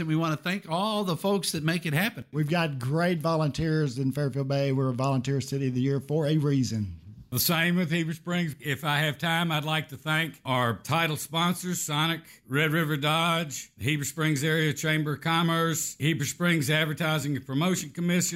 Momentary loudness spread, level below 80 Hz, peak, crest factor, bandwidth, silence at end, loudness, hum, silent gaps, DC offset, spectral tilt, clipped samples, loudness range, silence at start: 5 LU; -60 dBFS; -10 dBFS; 16 dB; 16 kHz; 0 s; -27 LUFS; none; none; under 0.1%; -4.5 dB/octave; under 0.1%; 1 LU; 0 s